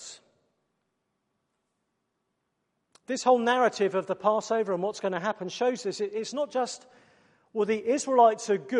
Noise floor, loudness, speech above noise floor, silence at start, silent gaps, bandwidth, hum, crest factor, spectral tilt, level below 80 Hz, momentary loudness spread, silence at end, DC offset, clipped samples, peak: -79 dBFS; -27 LUFS; 53 dB; 0 s; none; 11 kHz; none; 20 dB; -4 dB/octave; -80 dBFS; 10 LU; 0 s; under 0.1%; under 0.1%; -10 dBFS